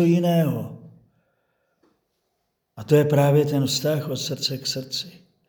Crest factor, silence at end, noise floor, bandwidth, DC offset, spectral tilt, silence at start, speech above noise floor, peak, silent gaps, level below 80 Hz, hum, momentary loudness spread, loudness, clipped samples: 20 dB; 0.4 s; -75 dBFS; over 20 kHz; under 0.1%; -6 dB/octave; 0 s; 54 dB; -4 dBFS; none; -68 dBFS; none; 13 LU; -22 LUFS; under 0.1%